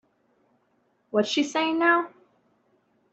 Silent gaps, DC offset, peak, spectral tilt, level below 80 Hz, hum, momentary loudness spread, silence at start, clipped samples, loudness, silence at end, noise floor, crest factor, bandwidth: none; under 0.1%; -8 dBFS; -3.5 dB/octave; -76 dBFS; none; 7 LU; 1.15 s; under 0.1%; -24 LUFS; 1.05 s; -69 dBFS; 20 dB; 8.2 kHz